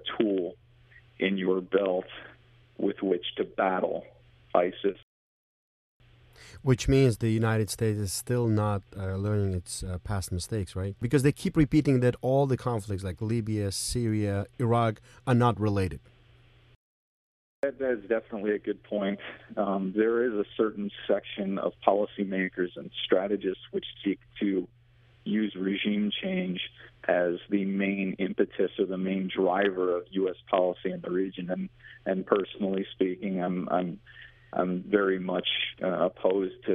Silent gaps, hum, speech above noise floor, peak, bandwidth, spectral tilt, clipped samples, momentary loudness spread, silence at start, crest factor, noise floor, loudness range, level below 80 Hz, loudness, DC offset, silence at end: 5.03-6.00 s, 16.76-17.63 s; none; 30 dB; -6 dBFS; 14 kHz; -6 dB/octave; under 0.1%; 9 LU; 0 s; 24 dB; -58 dBFS; 4 LU; -52 dBFS; -29 LUFS; under 0.1%; 0 s